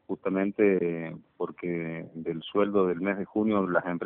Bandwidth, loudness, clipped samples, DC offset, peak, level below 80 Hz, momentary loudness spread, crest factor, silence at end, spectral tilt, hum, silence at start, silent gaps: 3.9 kHz; -28 LUFS; under 0.1%; under 0.1%; -10 dBFS; -68 dBFS; 12 LU; 18 dB; 0 s; -6 dB/octave; none; 0.1 s; none